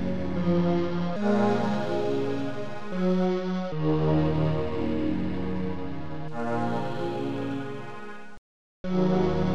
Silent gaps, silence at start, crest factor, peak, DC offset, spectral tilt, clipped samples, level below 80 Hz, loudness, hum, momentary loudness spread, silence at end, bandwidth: 8.38-8.84 s; 0 s; 14 dB; -12 dBFS; 2%; -8.5 dB/octave; under 0.1%; -46 dBFS; -28 LUFS; none; 12 LU; 0 s; 8.6 kHz